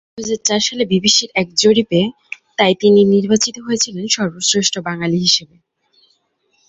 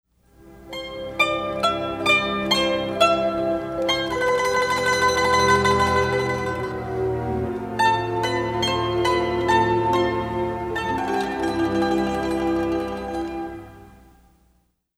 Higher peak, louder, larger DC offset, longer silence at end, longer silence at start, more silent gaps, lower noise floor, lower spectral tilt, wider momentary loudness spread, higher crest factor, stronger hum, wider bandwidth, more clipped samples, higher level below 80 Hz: first, 0 dBFS vs -4 dBFS; first, -15 LUFS vs -22 LUFS; neither; first, 1.25 s vs 1.1 s; second, 0.15 s vs 0.45 s; neither; about the same, -63 dBFS vs -65 dBFS; about the same, -3.5 dB/octave vs -4.5 dB/octave; about the same, 8 LU vs 9 LU; about the same, 16 dB vs 18 dB; neither; second, 8.2 kHz vs 15.5 kHz; neither; second, -56 dBFS vs -44 dBFS